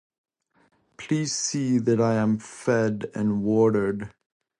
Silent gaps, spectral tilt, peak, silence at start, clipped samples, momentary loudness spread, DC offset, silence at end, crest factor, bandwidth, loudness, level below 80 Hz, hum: none; -5.5 dB/octave; -10 dBFS; 1 s; under 0.1%; 8 LU; under 0.1%; 0.5 s; 16 dB; 11 kHz; -24 LUFS; -60 dBFS; none